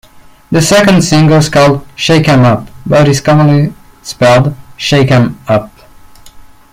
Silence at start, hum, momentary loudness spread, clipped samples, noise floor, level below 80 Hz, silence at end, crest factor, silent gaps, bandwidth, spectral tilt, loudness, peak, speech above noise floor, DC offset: 0.5 s; none; 9 LU; under 0.1%; -36 dBFS; -36 dBFS; 0.3 s; 10 dB; none; 16 kHz; -5.5 dB/octave; -9 LUFS; 0 dBFS; 28 dB; under 0.1%